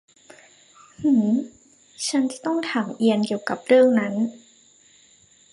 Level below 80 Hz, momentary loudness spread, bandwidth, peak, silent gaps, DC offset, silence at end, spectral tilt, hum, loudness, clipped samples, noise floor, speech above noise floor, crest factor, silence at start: -70 dBFS; 10 LU; 11.5 kHz; -6 dBFS; none; under 0.1%; 1.15 s; -5 dB/octave; none; -22 LUFS; under 0.1%; -55 dBFS; 35 dB; 18 dB; 1 s